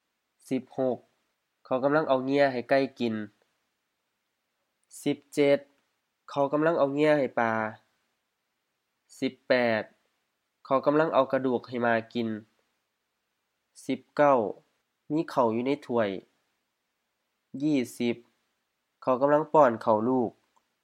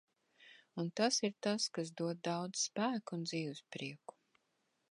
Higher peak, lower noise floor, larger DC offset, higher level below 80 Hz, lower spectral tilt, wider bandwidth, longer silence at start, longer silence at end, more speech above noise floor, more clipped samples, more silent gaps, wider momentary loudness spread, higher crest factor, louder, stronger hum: first, -6 dBFS vs -20 dBFS; about the same, -80 dBFS vs -82 dBFS; neither; first, -82 dBFS vs -90 dBFS; first, -6.5 dB/octave vs -3.5 dB/octave; first, 14.5 kHz vs 11.5 kHz; about the same, 0.5 s vs 0.4 s; second, 0.55 s vs 0.95 s; first, 54 dB vs 43 dB; neither; neither; about the same, 12 LU vs 13 LU; about the same, 22 dB vs 22 dB; first, -27 LUFS vs -38 LUFS; neither